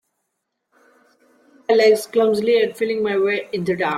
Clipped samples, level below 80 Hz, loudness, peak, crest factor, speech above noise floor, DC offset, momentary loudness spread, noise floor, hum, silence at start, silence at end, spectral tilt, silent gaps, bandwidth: under 0.1%; -66 dBFS; -18 LUFS; -4 dBFS; 16 dB; 58 dB; under 0.1%; 8 LU; -76 dBFS; none; 1.7 s; 0 s; -5 dB/octave; none; 14.5 kHz